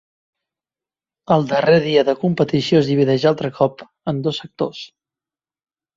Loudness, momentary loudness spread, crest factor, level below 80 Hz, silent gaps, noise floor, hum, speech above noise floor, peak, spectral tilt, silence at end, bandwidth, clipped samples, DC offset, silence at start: -18 LUFS; 11 LU; 18 dB; -58 dBFS; none; under -90 dBFS; none; over 73 dB; -2 dBFS; -7 dB/octave; 1.1 s; 7.6 kHz; under 0.1%; under 0.1%; 1.3 s